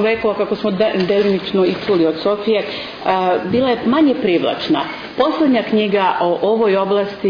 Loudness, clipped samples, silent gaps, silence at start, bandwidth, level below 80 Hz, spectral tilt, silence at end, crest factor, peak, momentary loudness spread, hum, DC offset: -16 LUFS; under 0.1%; none; 0 s; 5.2 kHz; -52 dBFS; -7.5 dB/octave; 0 s; 12 dB; -4 dBFS; 5 LU; none; under 0.1%